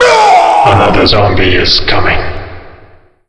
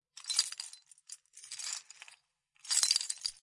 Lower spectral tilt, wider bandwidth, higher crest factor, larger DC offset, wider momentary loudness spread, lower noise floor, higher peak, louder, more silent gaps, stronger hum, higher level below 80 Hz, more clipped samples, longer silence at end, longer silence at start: first, -4.5 dB/octave vs 6.5 dB/octave; about the same, 11 kHz vs 11.5 kHz; second, 8 dB vs 30 dB; neither; second, 14 LU vs 24 LU; second, -39 dBFS vs -70 dBFS; first, 0 dBFS vs -8 dBFS; first, -7 LUFS vs -32 LUFS; neither; neither; first, -22 dBFS vs -84 dBFS; first, 0.5% vs under 0.1%; first, 0.6 s vs 0.1 s; second, 0 s vs 0.15 s